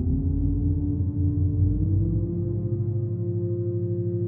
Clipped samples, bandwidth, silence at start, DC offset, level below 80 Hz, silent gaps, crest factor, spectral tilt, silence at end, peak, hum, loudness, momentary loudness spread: under 0.1%; 1.3 kHz; 0 s; under 0.1%; -34 dBFS; none; 12 dB; -16.5 dB/octave; 0 s; -12 dBFS; none; -26 LUFS; 4 LU